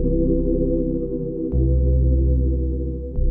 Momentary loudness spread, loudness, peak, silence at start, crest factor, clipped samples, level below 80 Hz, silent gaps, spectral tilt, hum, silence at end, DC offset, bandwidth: 7 LU; -22 LUFS; -8 dBFS; 0 s; 10 dB; under 0.1%; -22 dBFS; none; -16 dB/octave; none; 0 s; under 0.1%; 1.1 kHz